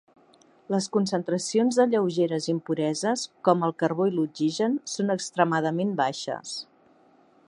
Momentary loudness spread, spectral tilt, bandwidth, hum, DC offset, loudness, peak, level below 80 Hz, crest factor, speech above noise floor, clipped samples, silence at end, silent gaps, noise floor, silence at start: 6 LU; -5 dB/octave; 11 kHz; none; under 0.1%; -26 LUFS; -6 dBFS; -76 dBFS; 20 dB; 34 dB; under 0.1%; 0.85 s; none; -59 dBFS; 0.7 s